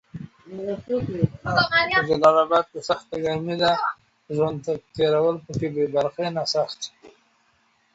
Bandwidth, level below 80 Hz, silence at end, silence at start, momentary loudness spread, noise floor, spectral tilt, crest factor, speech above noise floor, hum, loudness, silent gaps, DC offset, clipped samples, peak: 8 kHz; -54 dBFS; 0.85 s; 0.15 s; 14 LU; -64 dBFS; -5 dB/octave; 20 dB; 42 dB; none; -23 LUFS; none; under 0.1%; under 0.1%; -4 dBFS